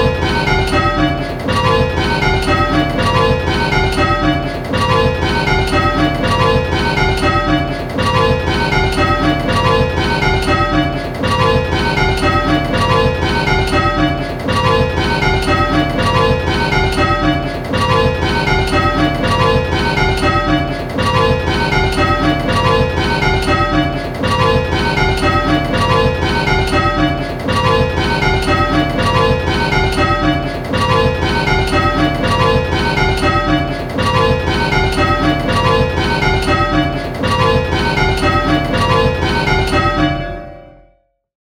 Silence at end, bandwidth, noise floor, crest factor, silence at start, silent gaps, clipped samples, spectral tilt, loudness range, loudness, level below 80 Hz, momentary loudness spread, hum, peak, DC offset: 0.85 s; 17 kHz; -55 dBFS; 14 dB; 0 s; none; under 0.1%; -6 dB/octave; 0 LU; -14 LUFS; -24 dBFS; 3 LU; none; 0 dBFS; under 0.1%